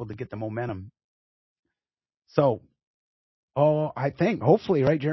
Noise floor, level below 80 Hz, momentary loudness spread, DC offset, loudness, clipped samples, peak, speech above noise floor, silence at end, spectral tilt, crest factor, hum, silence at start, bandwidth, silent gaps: under -90 dBFS; -58 dBFS; 13 LU; under 0.1%; -25 LUFS; under 0.1%; -6 dBFS; over 66 dB; 0 s; -9 dB/octave; 22 dB; none; 0 s; 6 kHz; 1.04-1.63 s, 2.83-3.48 s